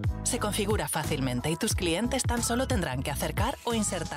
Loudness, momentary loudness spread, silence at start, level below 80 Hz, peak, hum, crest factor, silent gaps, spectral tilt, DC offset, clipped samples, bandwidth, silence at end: -29 LUFS; 3 LU; 0 s; -38 dBFS; -16 dBFS; none; 12 dB; none; -4 dB/octave; under 0.1%; under 0.1%; 16 kHz; 0 s